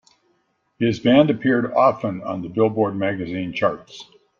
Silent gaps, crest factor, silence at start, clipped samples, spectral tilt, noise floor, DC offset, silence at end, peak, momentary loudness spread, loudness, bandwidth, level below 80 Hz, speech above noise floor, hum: none; 18 dB; 0.8 s; under 0.1%; -7.5 dB/octave; -67 dBFS; under 0.1%; 0.35 s; -2 dBFS; 12 LU; -20 LUFS; 7.2 kHz; -58 dBFS; 47 dB; none